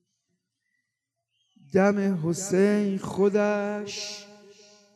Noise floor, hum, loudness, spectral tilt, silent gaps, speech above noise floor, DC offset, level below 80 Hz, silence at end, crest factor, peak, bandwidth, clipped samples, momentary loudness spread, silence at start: -83 dBFS; none; -25 LUFS; -5.5 dB/octave; none; 59 dB; under 0.1%; -72 dBFS; 0.65 s; 18 dB; -8 dBFS; 13 kHz; under 0.1%; 11 LU; 1.75 s